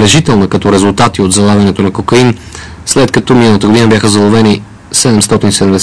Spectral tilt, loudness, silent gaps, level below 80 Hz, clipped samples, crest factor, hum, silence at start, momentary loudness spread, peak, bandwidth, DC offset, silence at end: -4.5 dB/octave; -8 LUFS; none; -34 dBFS; 0.8%; 8 dB; none; 0 s; 6 LU; 0 dBFS; 11 kHz; under 0.1%; 0 s